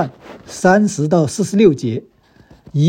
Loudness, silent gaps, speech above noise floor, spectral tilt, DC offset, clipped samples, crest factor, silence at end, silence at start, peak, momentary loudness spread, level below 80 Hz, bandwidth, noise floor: -15 LUFS; none; 33 dB; -6.5 dB/octave; under 0.1%; under 0.1%; 16 dB; 0 s; 0 s; 0 dBFS; 12 LU; -52 dBFS; 15.5 kHz; -48 dBFS